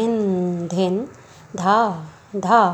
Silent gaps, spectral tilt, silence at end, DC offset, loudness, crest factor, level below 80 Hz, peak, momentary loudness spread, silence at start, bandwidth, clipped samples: none; -6.5 dB/octave; 0 s; under 0.1%; -20 LUFS; 18 dB; -62 dBFS; -2 dBFS; 15 LU; 0 s; 8.6 kHz; under 0.1%